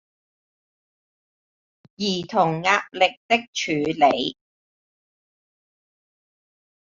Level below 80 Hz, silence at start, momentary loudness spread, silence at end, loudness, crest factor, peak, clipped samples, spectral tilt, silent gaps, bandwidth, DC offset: -66 dBFS; 2 s; 7 LU; 2.55 s; -22 LUFS; 22 dB; -4 dBFS; under 0.1%; -2 dB/octave; 3.17-3.29 s, 3.48-3.53 s; 7.6 kHz; under 0.1%